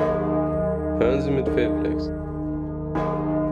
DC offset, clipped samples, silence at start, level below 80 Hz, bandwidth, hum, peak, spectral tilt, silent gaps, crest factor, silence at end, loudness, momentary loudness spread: under 0.1%; under 0.1%; 0 s; -38 dBFS; 7.4 kHz; none; -8 dBFS; -9 dB/octave; none; 16 dB; 0 s; -24 LUFS; 7 LU